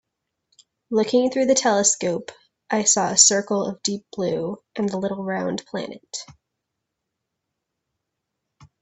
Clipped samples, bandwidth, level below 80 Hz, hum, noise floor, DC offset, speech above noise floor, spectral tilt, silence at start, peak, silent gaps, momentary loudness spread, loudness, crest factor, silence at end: under 0.1%; 8.6 kHz; -66 dBFS; none; -81 dBFS; under 0.1%; 59 dB; -2.5 dB/octave; 0.9 s; 0 dBFS; none; 17 LU; -21 LUFS; 24 dB; 2.5 s